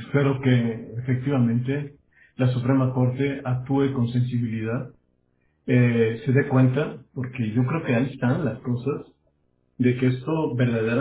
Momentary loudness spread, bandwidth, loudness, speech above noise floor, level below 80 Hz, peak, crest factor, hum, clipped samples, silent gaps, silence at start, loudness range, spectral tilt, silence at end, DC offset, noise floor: 10 LU; 4 kHz; -24 LUFS; 45 dB; -56 dBFS; -6 dBFS; 18 dB; none; under 0.1%; none; 0 s; 2 LU; -12 dB/octave; 0 s; under 0.1%; -68 dBFS